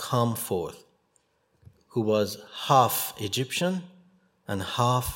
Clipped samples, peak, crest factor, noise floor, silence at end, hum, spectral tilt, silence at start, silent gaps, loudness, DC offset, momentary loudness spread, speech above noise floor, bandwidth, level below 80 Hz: under 0.1%; -6 dBFS; 22 dB; -69 dBFS; 0 s; none; -4.5 dB/octave; 0 s; none; -27 LUFS; under 0.1%; 14 LU; 43 dB; 16.5 kHz; -54 dBFS